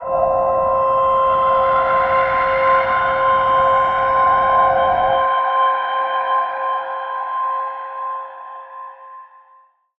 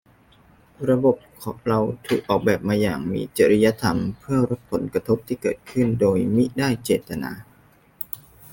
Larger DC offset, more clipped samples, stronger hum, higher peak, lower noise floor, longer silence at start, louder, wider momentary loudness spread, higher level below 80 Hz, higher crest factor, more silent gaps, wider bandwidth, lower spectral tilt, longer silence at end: neither; neither; neither; about the same, -4 dBFS vs -4 dBFS; about the same, -52 dBFS vs -55 dBFS; second, 0 s vs 0.8 s; first, -16 LUFS vs -22 LUFS; about the same, 12 LU vs 13 LU; first, -46 dBFS vs -52 dBFS; about the same, 14 dB vs 18 dB; neither; second, 5.6 kHz vs 17 kHz; about the same, -6 dB/octave vs -6.5 dB/octave; first, 0.7 s vs 0.35 s